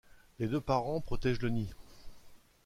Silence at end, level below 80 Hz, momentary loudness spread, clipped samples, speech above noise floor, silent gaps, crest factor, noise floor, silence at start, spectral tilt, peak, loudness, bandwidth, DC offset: 0.3 s; -48 dBFS; 7 LU; under 0.1%; 23 dB; none; 18 dB; -55 dBFS; 0.4 s; -7.5 dB/octave; -18 dBFS; -35 LUFS; 15 kHz; under 0.1%